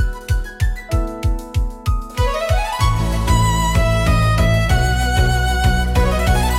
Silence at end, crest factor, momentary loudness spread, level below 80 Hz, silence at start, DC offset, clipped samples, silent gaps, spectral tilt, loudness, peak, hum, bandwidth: 0 s; 12 dB; 7 LU; -20 dBFS; 0 s; under 0.1%; under 0.1%; none; -5 dB/octave; -18 LUFS; -4 dBFS; none; 16 kHz